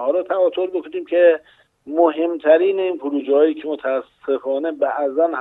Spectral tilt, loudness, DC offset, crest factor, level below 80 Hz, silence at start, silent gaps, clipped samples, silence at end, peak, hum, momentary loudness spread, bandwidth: -6.5 dB/octave; -19 LUFS; under 0.1%; 16 dB; -72 dBFS; 0 s; none; under 0.1%; 0 s; -2 dBFS; none; 9 LU; 4 kHz